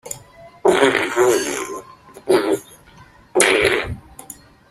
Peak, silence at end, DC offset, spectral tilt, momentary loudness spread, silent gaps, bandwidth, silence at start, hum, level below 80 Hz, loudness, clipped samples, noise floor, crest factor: 0 dBFS; 0.35 s; under 0.1%; -3 dB/octave; 22 LU; none; 15.5 kHz; 0.05 s; none; -48 dBFS; -17 LUFS; under 0.1%; -47 dBFS; 20 dB